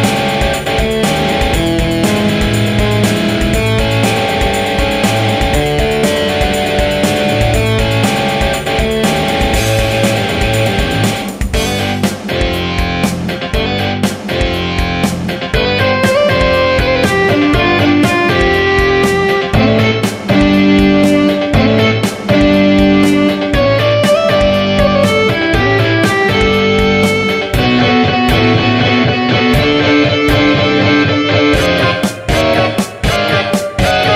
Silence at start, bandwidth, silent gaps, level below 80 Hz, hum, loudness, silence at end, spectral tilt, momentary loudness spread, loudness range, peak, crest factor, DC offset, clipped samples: 0 s; 16 kHz; none; -24 dBFS; none; -12 LUFS; 0 s; -5 dB/octave; 5 LU; 4 LU; 0 dBFS; 12 dB; under 0.1%; under 0.1%